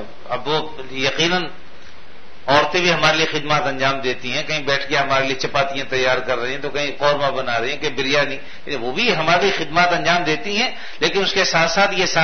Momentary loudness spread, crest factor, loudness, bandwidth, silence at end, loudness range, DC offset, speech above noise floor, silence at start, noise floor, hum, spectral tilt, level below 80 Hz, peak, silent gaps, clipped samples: 8 LU; 20 dB; -18 LUFS; 6.6 kHz; 0 s; 3 LU; 4%; 25 dB; 0 s; -44 dBFS; none; -3.5 dB/octave; -48 dBFS; 0 dBFS; none; under 0.1%